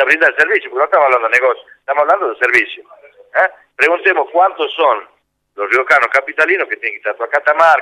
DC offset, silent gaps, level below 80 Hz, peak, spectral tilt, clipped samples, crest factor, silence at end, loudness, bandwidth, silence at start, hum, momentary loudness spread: under 0.1%; none; -68 dBFS; 0 dBFS; -2.5 dB/octave; under 0.1%; 14 dB; 0 s; -13 LUFS; 15 kHz; 0 s; none; 9 LU